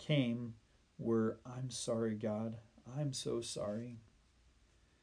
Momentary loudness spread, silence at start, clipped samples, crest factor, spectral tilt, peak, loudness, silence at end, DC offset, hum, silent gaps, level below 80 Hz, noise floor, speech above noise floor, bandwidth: 14 LU; 0 s; under 0.1%; 20 dB; -5.5 dB/octave; -22 dBFS; -40 LUFS; 1.05 s; under 0.1%; none; none; -70 dBFS; -70 dBFS; 31 dB; 10.5 kHz